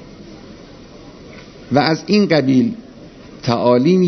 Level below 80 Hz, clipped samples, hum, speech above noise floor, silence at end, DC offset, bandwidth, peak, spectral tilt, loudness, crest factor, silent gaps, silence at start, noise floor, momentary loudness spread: -50 dBFS; under 0.1%; none; 25 dB; 0 s; under 0.1%; 6.4 kHz; 0 dBFS; -7 dB/octave; -16 LUFS; 18 dB; none; 0 s; -39 dBFS; 24 LU